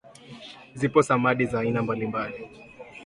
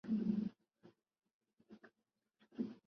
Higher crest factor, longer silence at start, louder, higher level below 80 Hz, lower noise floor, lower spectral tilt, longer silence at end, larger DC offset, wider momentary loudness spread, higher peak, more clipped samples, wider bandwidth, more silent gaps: about the same, 22 dB vs 18 dB; about the same, 0.05 s vs 0.05 s; first, -25 LUFS vs -42 LUFS; first, -58 dBFS vs -80 dBFS; second, -45 dBFS vs -88 dBFS; second, -6.5 dB/octave vs -9.5 dB/octave; about the same, 0 s vs 0.1 s; neither; second, 22 LU vs 25 LU; first, -4 dBFS vs -26 dBFS; neither; first, 11.5 kHz vs 5.8 kHz; second, none vs 1.34-1.40 s